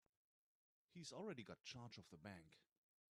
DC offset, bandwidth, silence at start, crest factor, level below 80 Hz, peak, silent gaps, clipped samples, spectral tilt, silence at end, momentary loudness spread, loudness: under 0.1%; 12.5 kHz; 0.9 s; 18 dB; -88 dBFS; -40 dBFS; none; under 0.1%; -4.5 dB/octave; 0.5 s; 8 LU; -57 LUFS